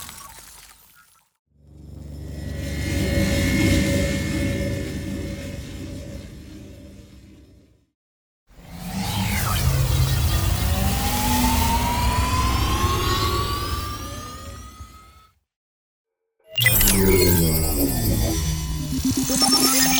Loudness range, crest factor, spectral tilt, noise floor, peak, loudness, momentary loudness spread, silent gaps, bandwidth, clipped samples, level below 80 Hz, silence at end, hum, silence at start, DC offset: 14 LU; 18 dB; -4 dB/octave; -55 dBFS; -4 dBFS; -21 LUFS; 22 LU; 1.39-1.46 s, 7.95-8.46 s, 15.56-16.05 s; over 20 kHz; under 0.1%; -30 dBFS; 0 s; none; 0 s; under 0.1%